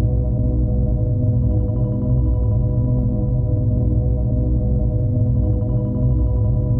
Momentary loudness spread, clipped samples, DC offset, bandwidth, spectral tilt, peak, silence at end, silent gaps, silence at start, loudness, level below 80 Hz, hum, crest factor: 1 LU; under 0.1%; under 0.1%; 1.4 kHz; -15 dB/octave; -8 dBFS; 0 s; none; 0 s; -19 LUFS; -22 dBFS; none; 10 dB